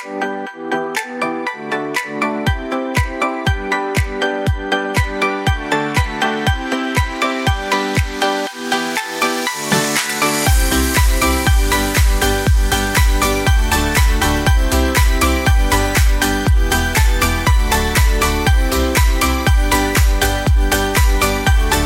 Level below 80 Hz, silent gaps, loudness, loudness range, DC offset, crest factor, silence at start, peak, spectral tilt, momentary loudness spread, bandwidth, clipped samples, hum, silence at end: -18 dBFS; none; -16 LUFS; 4 LU; under 0.1%; 14 dB; 0 s; 0 dBFS; -4 dB/octave; 6 LU; 17 kHz; under 0.1%; none; 0 s